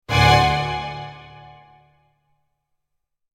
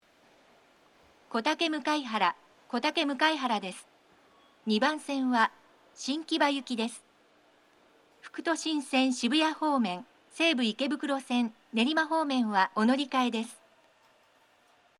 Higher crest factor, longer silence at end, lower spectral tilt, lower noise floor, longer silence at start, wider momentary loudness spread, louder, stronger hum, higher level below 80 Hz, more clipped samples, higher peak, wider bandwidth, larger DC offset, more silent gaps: about the same, 22 dB vs 20 dB; first, 2.05 s vs 1.45 s; about the same, -4.5 dB/octave vs -3.5 dB/octave; first, -75 dBFS vs -64 dBFS; second, 0.1 s vs 1.3 s; first, 23 LU vs 10 LU; first, -18 LUFS vs -29 LUFS; neither; first, -36 dBFS vs -88 dBFS; neither; first, -2 dBFS vs -10 dBFS; first, 15.5 kHz vs 12.5 kHz; neither; neither